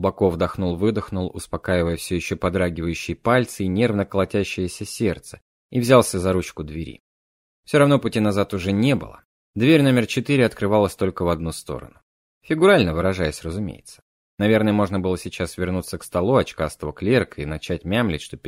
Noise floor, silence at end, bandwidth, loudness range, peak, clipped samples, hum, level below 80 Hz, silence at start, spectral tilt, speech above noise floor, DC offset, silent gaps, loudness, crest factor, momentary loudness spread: under -90 dBFS; 0 s; 16 kHz; 3 LU; -2 dBFS; under 0.1%; none; -44 dBFS; 0 s; -6 dB/octave; over 69 dB; under 0.1%; 5.42-5.69 s, 7.00-7.63 s, 9.25-9.54 s, 12.03-12.41 s, 14.02-14.38 s; -21 LUFS; 20 dB; 13 LU